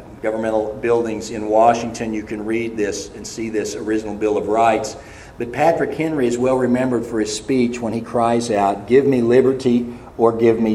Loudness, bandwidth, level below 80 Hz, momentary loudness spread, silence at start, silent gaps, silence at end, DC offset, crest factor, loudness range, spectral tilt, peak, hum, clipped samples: -19 LUFS; 12.5 kHz; -48 dBFS; 11 LU; 0 s; none; 0 s; under 0.1%; 18 dB; 4 LU; -5.5 dB/octave; 0 dBFS; none; under 0.1%